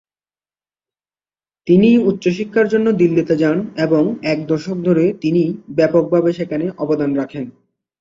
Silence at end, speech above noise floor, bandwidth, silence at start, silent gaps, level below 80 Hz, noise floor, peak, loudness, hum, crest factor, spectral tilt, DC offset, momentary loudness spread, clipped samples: 0.5 s; over 75 dB; 7.6 kHz; 1.65 s; none; -56 dBFS; under -90 dBFS; -2 dBFS; -16 LUFS; none; 16 dB; -8 dB/octave; under 0.1%; 8 LU; under 0.1%